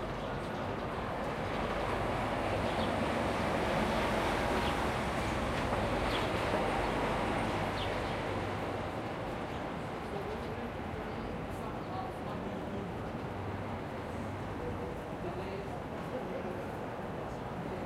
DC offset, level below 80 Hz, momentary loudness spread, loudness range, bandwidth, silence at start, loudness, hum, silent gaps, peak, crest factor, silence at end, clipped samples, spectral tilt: under 0.1%; -48 dBFS; 8 LU; 7 LU; 16.5 kHz; 0 s; -36 LUFS; none; none; -18 dBFS; 18 dB; 0 s; under 0.1%; -6 dB/octave